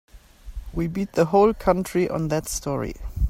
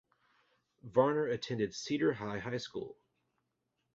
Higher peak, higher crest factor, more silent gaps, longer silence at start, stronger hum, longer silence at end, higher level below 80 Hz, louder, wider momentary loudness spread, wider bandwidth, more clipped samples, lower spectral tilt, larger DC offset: first, -6 dBFS vs -16 dBFS; about the same, 18 dB vs 22 dB; neither; second, 0.15 s vs 0.85 s; neither; second, 0 s vs 1 s; first, -34 dBFS vs -70 dBFS; first, -23 LUFS vs -35 LUFS; first, 15 LU vs 12 LU; first, 16 kHz vs 7.6 kHz; neither; about the same, -6 dB/octave vs -5 dB/octave; neither